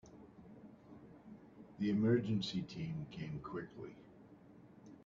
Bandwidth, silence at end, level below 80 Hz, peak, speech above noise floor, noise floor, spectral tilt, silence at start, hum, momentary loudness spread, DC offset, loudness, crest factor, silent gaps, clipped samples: 7.4 kHz; 0.05 s; -72 dBFS; -20 dBFS; 22 dB; -61 dBFS; -6.5 dB/octave; 0.05 s; none; 26 LU; under 0.1%; -39 LUFS; 20 dB; none; under 0.1%